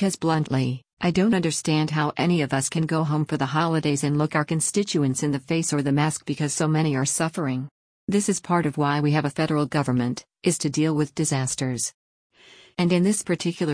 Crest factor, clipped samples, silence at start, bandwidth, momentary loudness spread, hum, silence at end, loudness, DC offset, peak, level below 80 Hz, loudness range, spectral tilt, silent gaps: 16 dB; under 0.1%; 0 s; 10.5 kHz; 5 LU; none; 0 s; -23 LUFS; under 0.1%; -8 dBFS; -58 dBFS; 2 LU; -5 dB/octave; 0.93-0.97 s, 7.71-8.08 s, 11.94-12.30 s